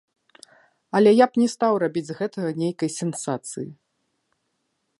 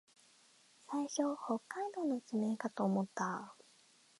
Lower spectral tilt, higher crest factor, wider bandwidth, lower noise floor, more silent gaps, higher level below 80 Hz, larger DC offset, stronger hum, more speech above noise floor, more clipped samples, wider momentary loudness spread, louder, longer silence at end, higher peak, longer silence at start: about the same, -5.5 dB/octave vs -5.5 dB/octave; about the same, 20 dB vs 18 dB; about the same, 11.5 kHz vs 11.5 kHz; first, -74 dBFS vs -67 dBFS; neither; first, -74 dBFS vs -88 dBFS; neither; neither; first, 53 dB vs 30 dB; neither; first, 13 LU vs 7 LU; first, -22 LUFS vs -39 LUFS; first, 1.25 s vs 0.65 s; first, -4 dBFS vs -22 dBFS; about the same, 0.95 s vs 0.9 s